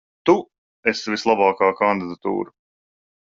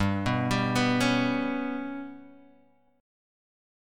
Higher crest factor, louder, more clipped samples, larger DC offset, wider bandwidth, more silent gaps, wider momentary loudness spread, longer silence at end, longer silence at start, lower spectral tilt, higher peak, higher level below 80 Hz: about the same, 18 dB vs 18 dB; first, -20 LUFS vs -27 LUFS; neither; neither; second, 7.6 kHz vs 16 kHz; first, 0.58-0.83 s vs none; second, 8 LU vs 13 LU; second, 0.9 s vs 1.7 s; first, 0.25 s vs 0 s; about the same, -5 dB/octave vs -5.5 dB/octave; first, -2 dBFS vs -12 dBFS; second, -64 dBFS vs -52 dBFS